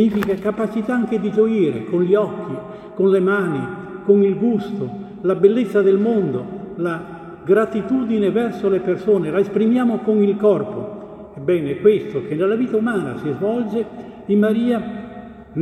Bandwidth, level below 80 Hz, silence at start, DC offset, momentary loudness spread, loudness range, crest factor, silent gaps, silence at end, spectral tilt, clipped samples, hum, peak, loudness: 12.5 kHz; -56 dBFS; 0 s; under 0.1%; 14 LU; 2 LU; 18 dB; none; 0 s; -8.5 dB/octave; under 0.1%; none; -2 dBFS; -19 LUFS